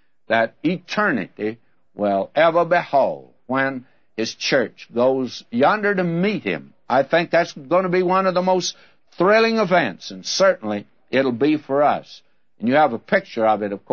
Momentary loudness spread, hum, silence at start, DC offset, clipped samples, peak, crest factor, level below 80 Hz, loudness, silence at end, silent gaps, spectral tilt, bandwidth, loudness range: 10 LU; none; 0.3 s; 0.2%; under 0.1%; -4 dBFS; 16 dB; -70 dBFS; -20 LUFS; 0.15 s; none; -5 dB/octave; 7 kHz; 2 LU